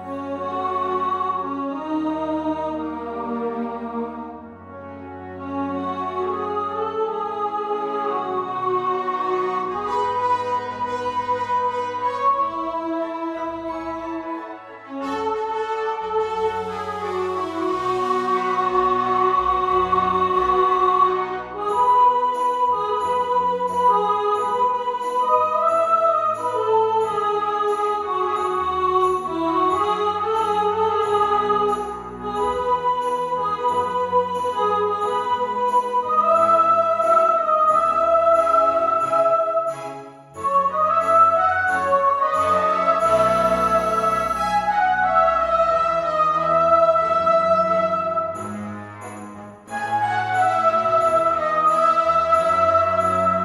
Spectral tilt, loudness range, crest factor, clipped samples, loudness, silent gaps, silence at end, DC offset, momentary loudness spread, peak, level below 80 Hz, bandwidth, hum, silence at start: -5.5 dB/octave; 8 LU; 16 dB; under 0.1%; -20 LUFS; none; 0 s; under 0.1%; 11 LU; -6 dBFS; -52 dBFS; 13.5 kHz; none; 0 s